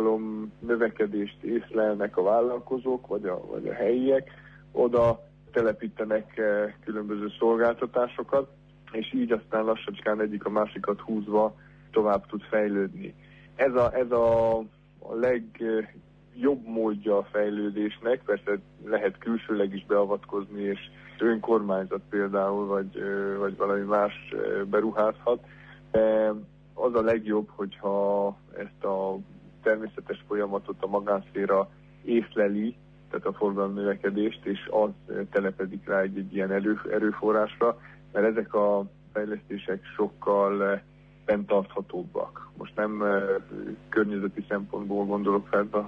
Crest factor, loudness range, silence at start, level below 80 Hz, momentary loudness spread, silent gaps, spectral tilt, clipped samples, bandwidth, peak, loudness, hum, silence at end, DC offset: 14 dB; 2 LU; 0 s; -58 dBFS; 10 LU; none; -8.5 dB/octave; under 0.1%; 5.8 kHz; -12 dBFS; -28 LUFS; 50 Hz at -55 dBFS; 0 s; under 0.1%